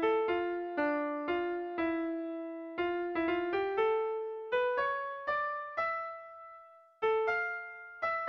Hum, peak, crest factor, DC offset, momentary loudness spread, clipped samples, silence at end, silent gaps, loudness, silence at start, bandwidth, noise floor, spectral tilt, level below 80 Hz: none; -20 dBFS; 14 dB; under 0.1%; 10 LU; under 0.1%; 0 s; none; -34 LUFS; 0 s; 6.2 kHz; -56 dBFS; -6 dB/octave; -70 dBFS